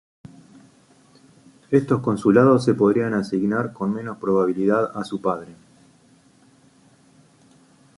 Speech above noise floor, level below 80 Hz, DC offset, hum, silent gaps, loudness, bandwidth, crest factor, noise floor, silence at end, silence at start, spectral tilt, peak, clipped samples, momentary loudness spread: 36 dB; -62 dBFS; under 0.1%; none; none; -21 LUFS; 11.5 kHz; 20 dB; -55 dBFS; 2.45 s; 1.7 s; -8 dB/octave; -2 dBFS; under 0.1%; 10 LU